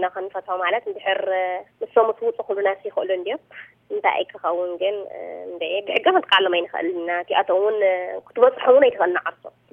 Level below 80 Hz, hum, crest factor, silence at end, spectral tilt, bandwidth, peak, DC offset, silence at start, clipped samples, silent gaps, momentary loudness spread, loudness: -74 dBFS; none; 20 dB; 0.25 s; -5 dB/octave; 4 kHz; -2 dBFS; under 0.1%; 0 s; under 0.1%; none; 13 LU; -21 LUFS